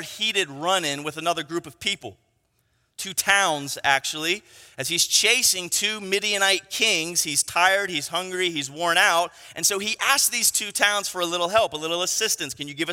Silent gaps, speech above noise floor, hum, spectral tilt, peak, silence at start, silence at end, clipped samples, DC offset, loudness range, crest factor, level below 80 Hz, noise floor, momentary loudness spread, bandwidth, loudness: none; 45 dB; none; -0.5 dB/octave; -2 dBFS; 0 s; 0 s; under 0.1%; under 0.1%; 4 LU; 22 dB; -66 dBFS; -69 dBFS; 9 LU; 16.5 kHz; -22 LUFS